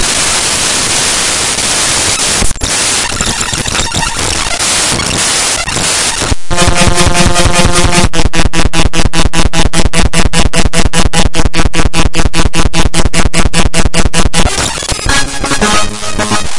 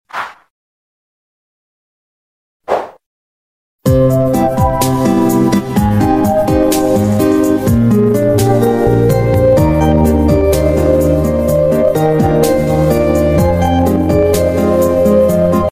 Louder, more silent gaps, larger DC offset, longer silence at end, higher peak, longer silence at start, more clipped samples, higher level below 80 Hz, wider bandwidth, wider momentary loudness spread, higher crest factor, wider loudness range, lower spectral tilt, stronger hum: about the same, -10 LUFS vs -12 LUFS; second, none vs 0.50-2.60 s, 3.06-3.79 s; second, under 0.1% vs 0.6%; about the same, 0 s vs 0 s; about the same, 0 dBFS vs 0 dBFS; second, 0 s vs 0.15 s; first, 0.9% vs under 0.1%; first, -16 dBFS vs -26 dBFS; second, 12 kHz vs 16 kHz; about the same, 4 LU vs 3 LU; second, 6 dB vs 12 dB; second, 2 LU vs 7 LU; second, -2.5 dB/octave vs -7 dB/octave; neither